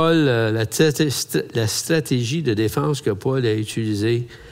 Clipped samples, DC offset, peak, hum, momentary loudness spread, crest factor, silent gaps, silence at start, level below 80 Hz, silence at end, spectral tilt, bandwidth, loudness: under 0.1%; under 0.1%; -4 dBFS; none; 5 LU; 16 dB; none; 0 s; -54 dBFS; 0 s; -5 dB/octave; 16 kHz; -20 LUFS